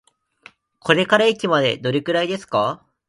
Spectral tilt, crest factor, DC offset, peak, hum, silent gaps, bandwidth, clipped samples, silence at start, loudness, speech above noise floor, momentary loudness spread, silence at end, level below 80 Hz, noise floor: -5 dB/octave; 20 dB; under 0.1%; 0 dBFS; none; none; 11.5 kHz; under 0.1%; 0.85 s; -19 LUFS; 31 dB; 6 LU; 0.35 s; -64 dBFS; -50 dBFS